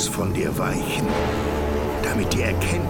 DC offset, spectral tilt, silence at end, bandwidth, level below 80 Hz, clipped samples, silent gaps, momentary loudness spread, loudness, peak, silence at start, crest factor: under 0.1%; -5 dB/octave; 0 s; 19 kHz; -32 dBFS; under 0.1%; none; 2 LU; -23 LUFS; -10 dBFS; 0 s; 14 dB